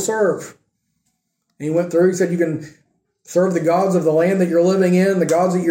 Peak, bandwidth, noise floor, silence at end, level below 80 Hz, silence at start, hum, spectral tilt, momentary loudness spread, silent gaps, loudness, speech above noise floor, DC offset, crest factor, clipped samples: -4 dBFS; 16.5 kHz; -72 dBFS; 0 s; -66 dBFS; 0 s; none; -6.5 dB/octave; 7 LU; none; -17 LUFS; 55 dB; under 0.1%; 14 dB; under 0.1%